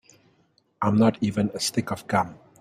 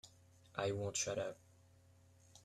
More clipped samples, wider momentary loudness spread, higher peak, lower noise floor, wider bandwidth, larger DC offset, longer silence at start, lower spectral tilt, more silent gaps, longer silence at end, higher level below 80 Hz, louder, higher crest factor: neither; second, 8 LU vs 19 LU; first, -6 dBFS vs -24 dBFS; about the same, -65 dBFS vs -67 dBFS; about the same, 15 kHz vs 14 kHz; neither; first, 0.8 s vs 0.05 s; first, -5.5 dB/octave vs -3.5 dB/octave; neither; first, 0.25 s vs 0.05 s; first, -60 dBFS vs -76 dBFS; first, -25 LUFS vs -41 LUFS; about the same, 20 dB vs 22 dB